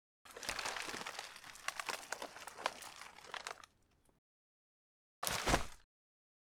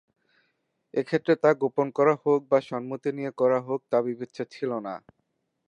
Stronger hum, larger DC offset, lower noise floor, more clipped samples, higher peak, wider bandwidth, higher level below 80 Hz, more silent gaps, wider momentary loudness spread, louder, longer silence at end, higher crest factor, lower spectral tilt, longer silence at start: neither; neither; about the same, -73 dBFS vs -76 dBFS; neither; second, -14 dBFS vs -6 dBFS; first, over 20 kHz vs 8.6 kHz; first, -58 dBFS vs -78 dBFS; first, 4.18-5.22 s vs none; first, 15 LU vs 12 LU; second, -42 LUFS vs -26 LUFS; about the same, 0.75 s vs 0.7 s; first, 30 dB vs 20 dB; second, -2 dB/octave vs -7.5 dB/octave; second, 0.25 s vs 0.95 s